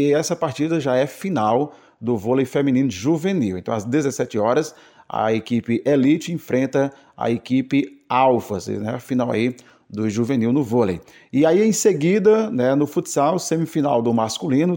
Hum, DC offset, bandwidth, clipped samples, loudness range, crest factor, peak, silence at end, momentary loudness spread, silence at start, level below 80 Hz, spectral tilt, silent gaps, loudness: none; under 0.1%; 17 kHz; under 0.1%; 3 LU; 16 dB; -4 dBFS; 0 s; 9 LU; 0 s; -60 dBFS; -6 dB/octave; none; -20 LUFS